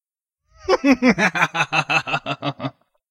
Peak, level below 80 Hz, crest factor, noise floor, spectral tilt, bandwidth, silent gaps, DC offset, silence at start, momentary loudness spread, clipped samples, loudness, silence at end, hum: -2 dBFS; -54 dBFS; 18 dB; -76 dBFS; -4.5 dB/octave; 15 kHz; none; under 0.1%; 0.65 s; 15 LU; under 0.1%; -19 LUFS; 0.4 s; none